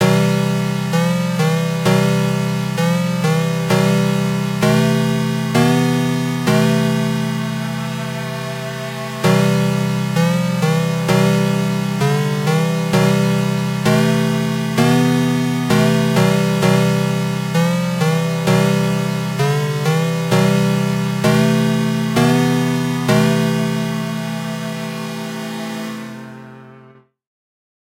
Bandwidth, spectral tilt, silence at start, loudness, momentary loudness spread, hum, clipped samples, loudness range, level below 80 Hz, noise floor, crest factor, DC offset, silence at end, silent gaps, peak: 16 kHz; -6 dB/octave; 0 s; -17 LUFS; 10 LU; none; under 0.1%; 4 LU; -52 dBFS; -46 dBFS; 16 dB; under 0.1%; 1.1 s; none; -2 dBFS